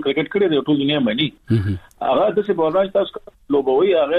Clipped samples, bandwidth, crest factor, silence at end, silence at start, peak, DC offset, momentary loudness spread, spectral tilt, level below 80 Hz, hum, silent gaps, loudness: under 0.1%; 5 kHz; 12 dB; 0 s; 0 s; -6 dBFS; under 0.1%; 6 LU; -8.5 dB/octave; -52 dBFS; none; none; -19 LUFS